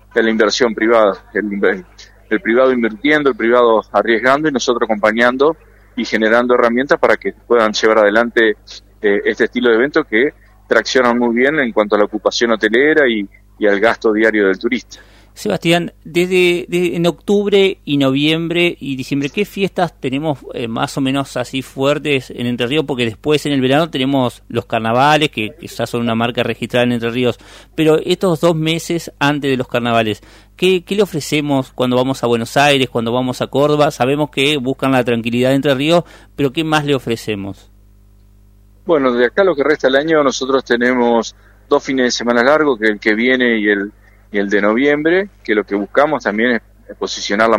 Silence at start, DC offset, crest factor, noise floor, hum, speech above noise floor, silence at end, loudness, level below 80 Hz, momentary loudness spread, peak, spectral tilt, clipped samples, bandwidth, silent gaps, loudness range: 0.15 s; under 0.1%; 14 dB; -46 dBFS; none; 31 dB; 0 s; -15 LUFS; -46 dBFS; 8 LU; 0 dBFS; -5 dB/octave; under 0.1%; 16 kHz; none; 4 LU